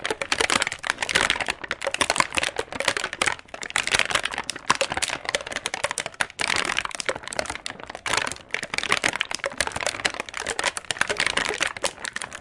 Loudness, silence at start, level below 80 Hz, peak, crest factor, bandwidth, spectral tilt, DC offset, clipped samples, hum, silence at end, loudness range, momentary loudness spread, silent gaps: -25 LUFS; 0 s; -52 dBFS; -2 dBFS; 26 dB; 11.5 kHz; -0.5 dB/octave; under 0.1%; under 0.1%; none; 0 s; 3 LU; 8 LU; none